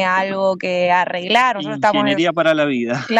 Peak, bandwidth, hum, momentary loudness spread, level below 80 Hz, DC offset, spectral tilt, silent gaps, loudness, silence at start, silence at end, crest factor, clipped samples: -2 dBFS; 10.5 kHz; none; 4 LU; -64 dBFS; under 0.1%; -5 dB/octave; none; -17 LUFS; 0 s; 0 s; 14 dB; under 0.1%